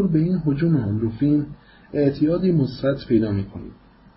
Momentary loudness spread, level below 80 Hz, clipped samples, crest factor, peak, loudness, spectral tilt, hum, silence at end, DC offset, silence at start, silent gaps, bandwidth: 12 LU; -46 dBFS; under 0.1%; 14 dB; -8 dBFS; -21 LUFS; -13 dB/octave; none; 0.45 s; under 0.1%; 0 s; none; 5.8 kHz